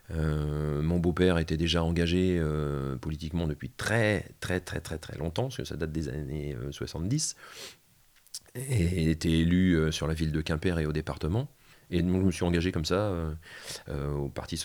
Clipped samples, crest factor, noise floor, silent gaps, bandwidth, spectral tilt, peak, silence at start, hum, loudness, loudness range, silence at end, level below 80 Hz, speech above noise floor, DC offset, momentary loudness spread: under 0.1%; 20 dB; -62 dBFS; none; 19.5 kHz; -6 dB/octave; -10 dBFS; 0.1 s; none; -30 LUFS; 6 LU; 0 s; -42 dBFS; 33 dB; under 0.1%; 12 LU